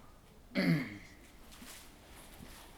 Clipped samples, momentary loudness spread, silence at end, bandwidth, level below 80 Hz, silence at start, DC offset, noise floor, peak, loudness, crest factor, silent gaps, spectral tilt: under 0.1%; 23 LU; 0 s; 20 kHz; -60 dBFS; 0 s; under 0.1%; -57 dBFS; -20 dBFS; -35 LUFS; 20 dB; none; -6 dB/octave